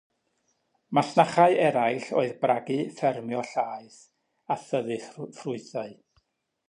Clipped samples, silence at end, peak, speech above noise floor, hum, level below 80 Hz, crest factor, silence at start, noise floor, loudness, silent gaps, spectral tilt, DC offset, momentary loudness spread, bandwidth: under 0.1%; 0.75 s; -4 dBFS; 48 dB; none; -76 dBFS; 22 dB; 0.9 s; -74 dBFS; -26 LUFS; none; -6 dB/octave; under 0.1%; 16 LU; 10.5 kHz